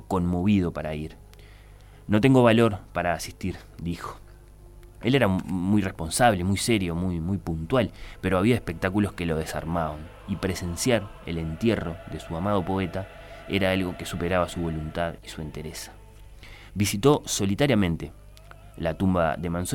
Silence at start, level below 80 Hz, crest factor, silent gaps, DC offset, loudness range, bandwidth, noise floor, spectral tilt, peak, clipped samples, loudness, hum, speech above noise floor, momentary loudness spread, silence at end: 0 s; -44 dBFS; 20 dB; none; under 0.1%; 4 LU; 17.5 kHz; -48 dBFS; -5.5 dB/octave; -6 dBFS; under 0.1%; -26 LUFS; 50 Hz at -50 dBFS; 23 dB; 14 LU; 0 s